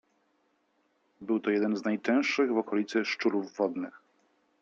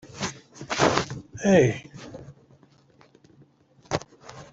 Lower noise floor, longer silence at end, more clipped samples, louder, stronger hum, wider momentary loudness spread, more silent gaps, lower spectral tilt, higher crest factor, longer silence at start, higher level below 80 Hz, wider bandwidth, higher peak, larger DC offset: first, -73 dBFS vs -58 dBFS; first, 0.65 s vs 0.1 s; neither; second, -29 LUFS vs -25 LUFS; neither; second, 6 LU vs 24 LU; neither; about the same, -5 dB/octave vs -5 dB/octave; second, 16 dB vs 24 dB; first, 1.2 s vs 0.05 s; second, -82 dBFS vs -56 dBFS; about the same, 7.6 kHz vs 8 kHz; second, -14 dBFS vs -4 dBFS; neither